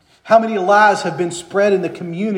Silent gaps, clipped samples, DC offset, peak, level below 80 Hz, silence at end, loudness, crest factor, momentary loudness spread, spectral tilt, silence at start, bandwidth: none; under 0.1%; under 0.1%; 0 dBFS; -64 dBFS; 0 s; -15 LUFS; 16 dB; 11 LU; -5 dB/octave; 0.25 s; 11 kHz